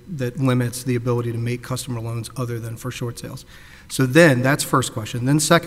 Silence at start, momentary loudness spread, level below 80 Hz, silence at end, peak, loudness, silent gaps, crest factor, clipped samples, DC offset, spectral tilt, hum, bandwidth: 0.05 s; 15 LU; -50 dBFS; 0 s; 0 dBFS; -21 LUFS; none; 20 dB; under 0.1%; under 0.1%; -5 dB/octave; none; 16 kHz